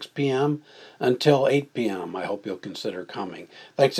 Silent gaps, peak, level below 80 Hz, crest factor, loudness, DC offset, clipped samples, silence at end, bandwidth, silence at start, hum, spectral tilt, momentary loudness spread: none; -4 dBFS; -80 dBFS; 22 dB; -25 LUFS; under 0.1%; under 0.1%; 0 s; 14 kHz; 0 s; none; -6 dB/octave; 14 LU